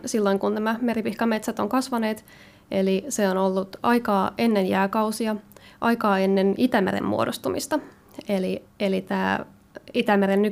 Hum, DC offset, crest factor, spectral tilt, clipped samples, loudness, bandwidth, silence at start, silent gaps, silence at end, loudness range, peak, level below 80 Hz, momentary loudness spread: none; under 0.1%; 16 dB; -5.5 dB/octave; under 0.1%; -24 LUFS; 16 kHz; 0 s; none; 0 s; 3 LU; -8 dBFS; -60 dBFS; 8 LU